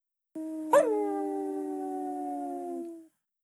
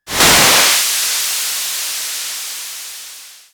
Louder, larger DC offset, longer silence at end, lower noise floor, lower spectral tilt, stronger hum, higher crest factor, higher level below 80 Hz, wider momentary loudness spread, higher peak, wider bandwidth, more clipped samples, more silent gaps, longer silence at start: second, -31 LUFS vs -12 LUFS; neither; first, 0.35 s vs 0.15 s; first, -53 dBFS vs -36 dBFS; first, -4.5 dB/octave vs 0 dB/octave; neither; about the same, 20 dB vs 16 dB; second, under -90 dBFS vs -44 dBFS; about the same, 17 LU vs 19 LU; second, -12 dBFS vs 0 dBFS; second, 12.5 kHz vs over 20 kHz; neither; neither; first, 0.35 s vs 0.05 s